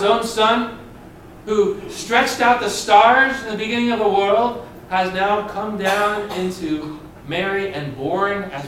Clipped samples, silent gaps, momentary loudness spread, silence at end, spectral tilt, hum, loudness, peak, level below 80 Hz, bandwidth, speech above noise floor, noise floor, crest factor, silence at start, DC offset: under 0.1%; none; 12 LU; 0 s; -4 dB/octave; none; -18 LUFS; 0 dBFS; -48 dBFS; 16.5 kHz; 22 dB; -40 dBFS; 18 dB; 0 s; under 0.1%